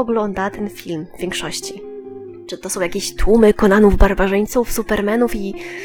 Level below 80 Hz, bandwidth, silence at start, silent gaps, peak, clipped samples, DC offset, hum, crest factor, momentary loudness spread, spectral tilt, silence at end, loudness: -26 dBFS; 20 kHz; 0 s; none; 0 dBFS; under 0.1%; under 0.1%; none; 16 dB; 19 LU; -5 dB/octave; 0 s; -17 LUFS